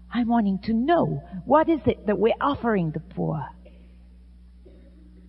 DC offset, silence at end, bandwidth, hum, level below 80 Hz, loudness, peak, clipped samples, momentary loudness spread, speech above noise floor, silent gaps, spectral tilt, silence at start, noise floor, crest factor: under 0.1%; 1.6 s; 5.6 kHz; none; -48 dBFS; -24 LUFS; -6 dBFS; under 0.1%; 9 LU; 25 dB; none; -10.5 dB/octave; 0 s; -48 dBFS; 18 dB